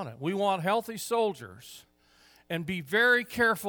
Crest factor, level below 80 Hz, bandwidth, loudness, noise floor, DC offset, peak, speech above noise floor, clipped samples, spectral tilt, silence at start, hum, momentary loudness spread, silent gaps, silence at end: 18 dB; -66 dBFS; over 20 kHz; -28 LUFS; -61 dBFS; under 0.1%; -12 dBFS; 33 dB; under 0.1%; -4 dB/octave; 0 s; none; 21 LU; none; 0 s